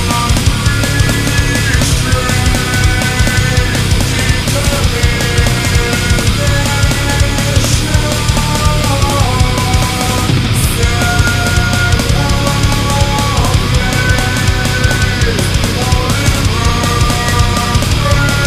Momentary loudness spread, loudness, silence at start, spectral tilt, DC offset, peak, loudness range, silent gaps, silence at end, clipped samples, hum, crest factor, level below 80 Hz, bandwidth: 1 LU; -12 LUFS; 0 s; -4 dB/octave; under 0.1%; 0 dBFS; 0 LU; none; 0 s; under 0.1%; none; 12 dB; -18 dBFS; 16 kHz